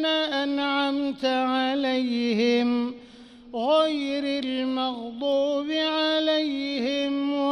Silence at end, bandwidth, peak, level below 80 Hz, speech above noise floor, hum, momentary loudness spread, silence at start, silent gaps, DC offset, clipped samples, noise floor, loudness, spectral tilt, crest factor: 0 s; 10 kHz; -10 dBFS; -66 dBFS; 22 dB; none; 6 LU; 0 s; none; under 0.1%; under 0.1%; -47 dBFS; -25 LUFS; -4.5 dB/octave; 14 dB